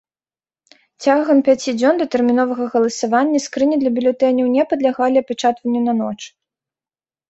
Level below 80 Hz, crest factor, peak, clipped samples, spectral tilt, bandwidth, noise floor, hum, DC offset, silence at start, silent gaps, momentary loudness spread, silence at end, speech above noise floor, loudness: -62 dBFS; 16 dB; -2 dBFS; under 0.1%; -4.5 dB/octave; 8.2 kHz; under -90 dBFS; none; under 0.1%; 1 s; none; 5 LU; 1 s; over 74 dB; -17 LUFS